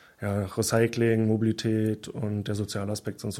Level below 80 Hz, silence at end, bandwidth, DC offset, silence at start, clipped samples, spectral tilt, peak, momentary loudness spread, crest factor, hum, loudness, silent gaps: -60 dBFS; 0 s; 16 kHz; under 0.1%; 0.2 s; under 0.1%; -6 dB/octave; -8 dBFS; 8 LU; 18 dB; none; -27 LUFS; none